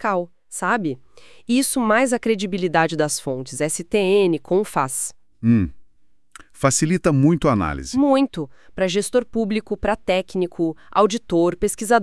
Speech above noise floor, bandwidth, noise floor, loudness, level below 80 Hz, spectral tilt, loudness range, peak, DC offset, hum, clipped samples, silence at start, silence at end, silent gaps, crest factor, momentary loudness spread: 31 dB; 12 kHz; -51 dBFS; -20 LUFS; -46 dBFS; -5 dB/octave; 2 LU; -2 dBFS; 0.5%; none; under 0.1%; 0 s; 0 s; none; 18 dB; 8 LU